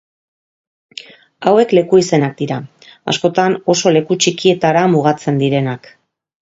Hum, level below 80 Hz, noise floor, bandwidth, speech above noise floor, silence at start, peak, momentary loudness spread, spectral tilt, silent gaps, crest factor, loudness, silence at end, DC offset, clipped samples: none; -58 dBFS; -37 dBFS; 8 kHz; 23 dB; 1.4 s; 0 dBFS; 17 LU; -5 dB/octave; none; 16 dB; -14 LUFS; 0.75 s; under 0.1%; under 0.1%